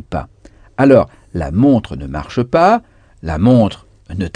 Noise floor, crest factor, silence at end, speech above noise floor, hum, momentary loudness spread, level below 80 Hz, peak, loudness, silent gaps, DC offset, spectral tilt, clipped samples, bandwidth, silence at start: -44 dBFS; 14 dB; 0.05 s; 31 dB; none; 16 LU; -34 dBFS; 0 dBFS; -14 LUFS; none; under 0.1%; -8.5 dB/octave; under 0.1%; 9.8 kHz; 0.1 s